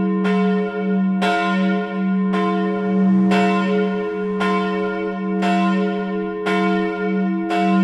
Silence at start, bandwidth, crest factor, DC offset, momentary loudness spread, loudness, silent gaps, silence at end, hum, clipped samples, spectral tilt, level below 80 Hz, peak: 0 s; 8.4 kHz; 12 dB; under 0.1%; 6 LU; -19 LUFS; none; 0 s; none; under 0.1%; -7.5 dB/octave; -60 dBFS; -6 dBFS